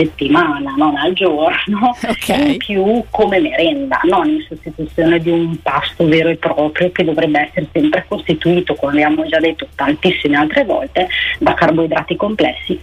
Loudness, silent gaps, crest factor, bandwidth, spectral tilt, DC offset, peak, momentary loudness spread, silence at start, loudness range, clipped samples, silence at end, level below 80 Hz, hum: -14 LUFS; none; 12 dB; 14.5 kHz; -6 dB/octave; under 0.1%; -2 dBFS; 5 LU; 0 s; 1 LU; under 0.1%; 0 s; -40 dBFS; none